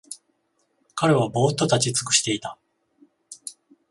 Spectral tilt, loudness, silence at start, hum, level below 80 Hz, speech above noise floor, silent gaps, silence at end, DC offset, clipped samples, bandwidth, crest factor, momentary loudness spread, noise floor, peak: -3.5 dB/octave; -21 LUFS; 0.1 s; none; -62 dBFS; 49 dB; none; 0.4 s; under 0.1%; under 0.1%; 11.5 kHz; 20 dB; 19 LU; -70 dBFS; -4 dBFS